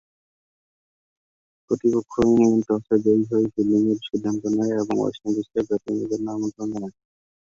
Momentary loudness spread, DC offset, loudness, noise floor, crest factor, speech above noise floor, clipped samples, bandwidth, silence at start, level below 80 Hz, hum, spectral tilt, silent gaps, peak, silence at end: 9 LU; under 0.1%; -22 LUFS; under -90 dBFS; 18 dB; over 68 dB; under 0.1%; 7.6 kHz; 1.7 s; -56 dBFS; none; -7 dB/octave; none; -6 dBFS; 0.65 s